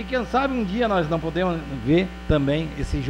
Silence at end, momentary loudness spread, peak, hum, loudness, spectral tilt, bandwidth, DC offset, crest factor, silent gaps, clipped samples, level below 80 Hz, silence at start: 0 s; 4 LU; -6 dBFS; none; -23 LUFS; -7 dB/octave; 16 kHz; under 0.1%; 16 dB; none; under 0.1%; -34 dBFS; 0 s